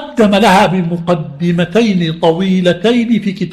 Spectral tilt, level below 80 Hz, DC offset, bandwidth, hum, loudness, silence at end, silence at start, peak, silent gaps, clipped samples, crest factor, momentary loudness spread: -6.5 dB/octave; -44 dBFS; under 0.1%; 14 kHz; none; -12 LUFS; 0 s; 0 s; 0 dBFS; none; under 0.1%; 12 dB; 7 LU